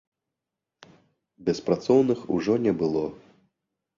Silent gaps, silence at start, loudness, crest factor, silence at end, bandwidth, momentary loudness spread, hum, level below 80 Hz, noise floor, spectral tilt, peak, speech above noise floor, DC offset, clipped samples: none; 1.4 s; -25 LUFS; 20 dB; 0.85 s; 7.4 kHz; 9 LU; none; -62 dBFS; -86 dBFS; -7 dB/octave; -8 dBFS; 63 dB; under 0.1%; under 0.1%